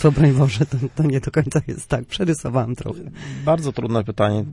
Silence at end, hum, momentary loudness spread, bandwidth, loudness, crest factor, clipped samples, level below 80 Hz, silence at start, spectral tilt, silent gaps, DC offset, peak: 0 s; none; 11 LU; 11.5 kHz; -20 LUFS; 18 dB; under 0.1%; -42 dBFS; 0 s; -7 dB/octave; none; under 0.1%; -2 dBFS